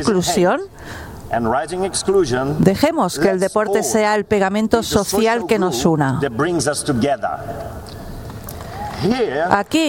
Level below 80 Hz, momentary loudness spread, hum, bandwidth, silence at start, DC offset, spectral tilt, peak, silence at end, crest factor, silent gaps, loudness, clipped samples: -40 dBFS; 15 LU; none; 18 kHz; 0 s; under 0.1%; -5 dB/octave; 0 dBFS; 0 s; 18 dB; none; -18 LUFS; under 0.1%